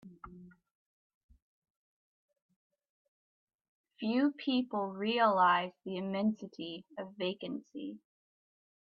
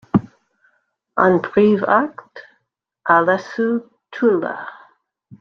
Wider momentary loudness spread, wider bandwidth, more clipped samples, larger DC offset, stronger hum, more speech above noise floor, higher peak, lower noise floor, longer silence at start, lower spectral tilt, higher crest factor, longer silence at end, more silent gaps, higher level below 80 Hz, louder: first, 18 LU vs 15 LU; about the same, 6.4 kHz vs 6.6 kHz; neither; neither; neither; second, 20 dB vs 55 dB; second, -16 dBFS vs -2 dBFS; second, -53 dBFS vs -72 dBFS; about the same, 0.05 s vs 0.15 s; about the same, -7 dB/octave vs -8 dB/octave; about the same, 20 dB vs 18 dB; first, 0.9 s vs 0.7 s; first, 0.71-1.29 s, 1.42-1.62 s, 1.70-2.28 s, 2.42-2.49 s, 2.56-2.70 s, 2.90-3.47 s, 3.55-3.84 s vs none; second, -76 dBFS vs -58 dBFS; second, -33 LUFS vs -18 LUFS